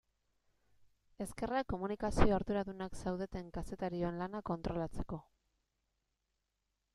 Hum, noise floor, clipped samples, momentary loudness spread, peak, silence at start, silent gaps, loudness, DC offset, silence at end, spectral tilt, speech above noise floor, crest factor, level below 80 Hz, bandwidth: none; -85 dBFS; under 0.1%; 13 LU; -12 dBFS; 1.2 s; none; -39 LUFS; under 0.1%; 1.75 s; -6.5 dB/octave; 49 dB; 26 dB; -48 dBFS; 13 kHz